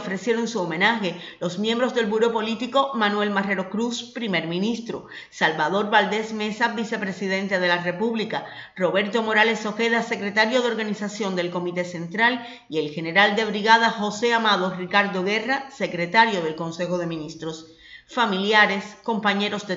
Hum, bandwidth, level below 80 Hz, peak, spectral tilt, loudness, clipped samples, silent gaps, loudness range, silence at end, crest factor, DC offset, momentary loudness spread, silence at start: none; 8 kHz; -68 dBFS; -2 dBFS; -4.5 dB/octave; -22 LUFS; under 0.1%; none; 4 LU; 0 s; 20 dB; under 0.1%; 10 LU; 0 s